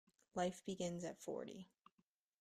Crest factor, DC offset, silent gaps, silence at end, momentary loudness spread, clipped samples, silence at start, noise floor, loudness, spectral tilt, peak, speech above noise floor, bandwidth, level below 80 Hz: 20 dB; under 0.1%; none; 0.75 s; 12 LU; under 0.1%; 0.35 s; -84 dBFS; -47 LUFS; -5 dB/octave; -28 dBFS; 38 dB; 14.5 kHz; -80 dBFS